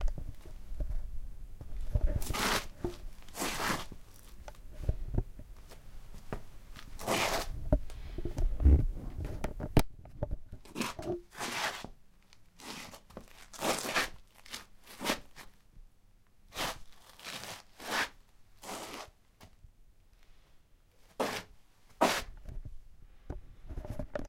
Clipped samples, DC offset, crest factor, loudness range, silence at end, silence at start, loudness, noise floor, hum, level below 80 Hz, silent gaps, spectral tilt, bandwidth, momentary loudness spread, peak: under 0.1%; under 0.1%; 26 dB; 8 LU; 0 s; 0 s; -36 LUFS; -61 dBFS; none; -40 dBFS; none; -4 dB/octave; 16.5 kHz; 22 LU; -10 dBFS